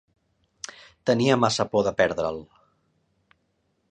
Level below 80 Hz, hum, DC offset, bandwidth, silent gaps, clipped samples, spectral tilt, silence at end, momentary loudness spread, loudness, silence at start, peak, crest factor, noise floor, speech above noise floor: -58 dBFS; none; under 0.1%; 10 kHz; none; under 0.1%; -5 dB/octave; 1.45 s; 19 LU; -23 LUFS; 1.05 s; -4 dBFS; 22 dB; -72 dBFS; 49 dB